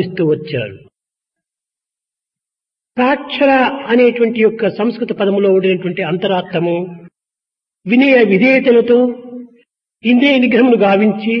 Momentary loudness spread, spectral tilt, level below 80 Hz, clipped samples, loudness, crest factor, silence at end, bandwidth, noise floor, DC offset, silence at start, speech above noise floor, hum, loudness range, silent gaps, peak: 12 LU; -8.5 dB/octave; -60 dBFS; under 0.1%; -13 LUFS; 14 dB; 0 s; 5.8 kHz; -86 dBFS; under 0.1%; 0 s; 74 dB; none; 6 LU; none; 0 dBFS